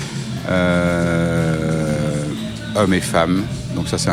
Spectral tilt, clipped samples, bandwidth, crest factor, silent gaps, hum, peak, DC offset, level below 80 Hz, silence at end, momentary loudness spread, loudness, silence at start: -5.5 dB/octave; under 0.1%; 15 kHz; 16 dB; none; none; -2 dBFS; under 0.1%; -38 dBFS; 0 s; 8 LU; -19 LUFS; 0 s